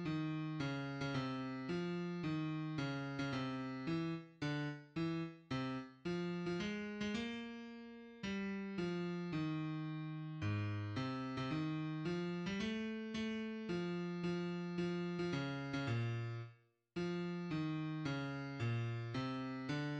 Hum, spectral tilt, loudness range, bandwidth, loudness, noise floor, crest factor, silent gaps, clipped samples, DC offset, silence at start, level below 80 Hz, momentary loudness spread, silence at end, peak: none; -7 dB/octave; 2 LU; 8.6 kHz; -42 LUFS; -64 dBFS; 14 dB; none; under 0.1%; under 0.1%; 0 s; -70 dBFS; 4 LU; 0 s; -28 dBFS